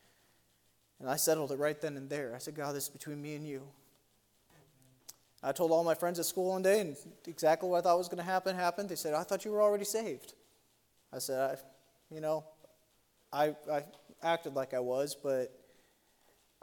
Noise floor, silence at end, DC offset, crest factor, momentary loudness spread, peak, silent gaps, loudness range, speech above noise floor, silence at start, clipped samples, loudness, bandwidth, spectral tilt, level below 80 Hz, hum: -72 dBFS; 1.15 s; under 0.1%; 20 dB; 16 LU; -16 dBFS; none; 9 LU; 38 dB; 1 s; under 0.1%; -34 LUFS; 17.5 kHz; -4 dB/octave; -82 dBFS; none